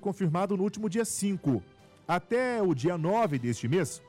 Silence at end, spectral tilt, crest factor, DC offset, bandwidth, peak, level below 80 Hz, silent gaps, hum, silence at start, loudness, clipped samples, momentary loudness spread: 0.1 s; -6 dB/octave; 10 dB; under 0.1%; 16 kHz; -20 dBFS; -66 dBFS; none; none; 0 s; -29 LUFS; under 0.1%; 4 LU